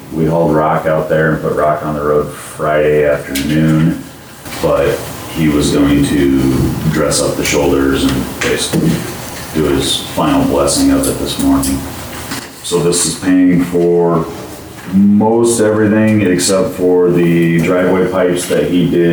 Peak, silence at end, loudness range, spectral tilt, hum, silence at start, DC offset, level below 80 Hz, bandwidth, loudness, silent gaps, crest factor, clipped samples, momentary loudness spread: -2 dBFS; 0 s; 3 LU; -5 dB/octave; none; 0 s; under 0.1%; -32 dBFS; over 20 kHz; -13 LUFS; none; 10 dB; under 0.1%; 10 LU